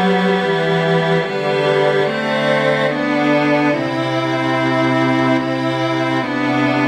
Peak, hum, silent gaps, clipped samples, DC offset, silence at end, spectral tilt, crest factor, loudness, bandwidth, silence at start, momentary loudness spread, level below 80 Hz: -2 dBFS; none; none; under 0.1%; under 0.1%; 0 s; -6.5 dB/octave; 14 dB; -16 LUFS; 13 kHz; 0 s; 3 LU; -56 dBFS